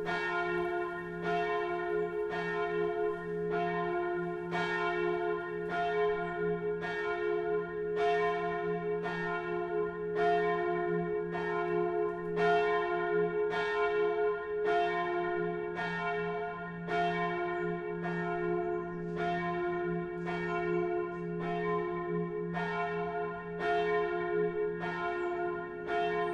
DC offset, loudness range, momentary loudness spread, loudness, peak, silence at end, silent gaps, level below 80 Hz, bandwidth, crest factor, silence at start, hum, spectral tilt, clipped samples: under 0.1%; 3 LU; 6 LU; -33 LUFS; -18 dBFS; 0 s; none; -62 dBFS; 8 kHz; 16 dB; 0 s; none; -7 dB/octave; under 0.1%